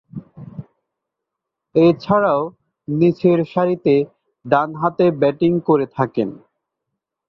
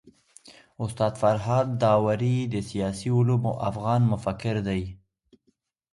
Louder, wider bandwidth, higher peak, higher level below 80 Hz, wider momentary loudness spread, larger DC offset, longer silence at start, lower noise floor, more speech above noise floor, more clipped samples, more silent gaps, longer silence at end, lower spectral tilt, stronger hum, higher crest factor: first, -18 LUFS vs -25 LUFS; second, 6 kHz vs 11.5 kHz; first, -2 dBFS vs -10 dBFS; second, -58 dBFS vs -52 dBFS; first, 21 LU vs 8 LU; neither; about the same, 0.15 s vs 0.05 s; first, -81 dBFS vs -71 dBFS; first, 65 dB vs 47 dB; neither; neither; about the same, 0.95 s vs 1 s; first, -9.5 dB/octave vs -7.5 dB/octave; neither; about the same, 18 dB vs 16 dB